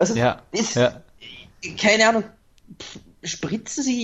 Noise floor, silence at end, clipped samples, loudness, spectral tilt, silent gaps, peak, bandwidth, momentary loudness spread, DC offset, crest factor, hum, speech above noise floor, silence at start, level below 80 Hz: -44 dBFS; 0 s; under 0.1%; -21 LUFS; -3.5 dB/octave; none; -2 dBFS; 8.4 kHz; 24 LU; under 0.1%; 20 dB; none; 22 dB; 0 s; -54 dBFS